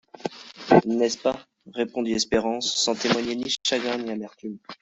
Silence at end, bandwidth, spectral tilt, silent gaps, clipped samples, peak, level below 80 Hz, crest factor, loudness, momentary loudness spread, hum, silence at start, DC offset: 0.05 s; 8.2 kHz; -3.5 dB/octave; none; under 0.1%; -2 dBFS; -56 dBFS; 22 dB; -24 LUFS; 17 LU; none; 0.25 s; under 0.1%